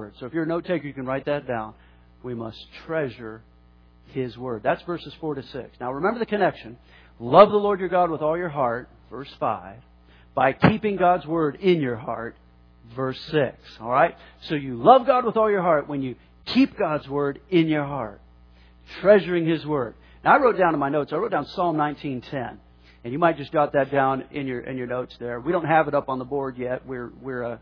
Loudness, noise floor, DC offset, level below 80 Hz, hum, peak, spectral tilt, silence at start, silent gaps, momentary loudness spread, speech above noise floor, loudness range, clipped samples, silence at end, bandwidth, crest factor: -23 LUFS; -53 dBFS; under 0.1%; -54 dBFS; none; 0 dBFS; -8.5 dB/octave; 0 s; none; 17 LU; 30 dB; 9 LU; under 0.1%; 0.05 s; 5.4 kHz; 24 dB